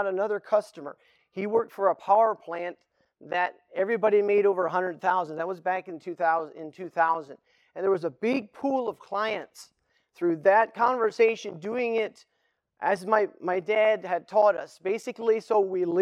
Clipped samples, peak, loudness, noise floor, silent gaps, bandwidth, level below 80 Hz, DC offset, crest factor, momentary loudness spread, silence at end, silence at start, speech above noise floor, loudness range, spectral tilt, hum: under 0.1%; -8 dBFS; -26 LUFS; -75 dBFS; none; 12 kHz; -84 dBFS; under 0.1%; 18 dB; 12 LU; 0 s; 0 s; 49 dB; 3 LU; -5.5 dB/octave; none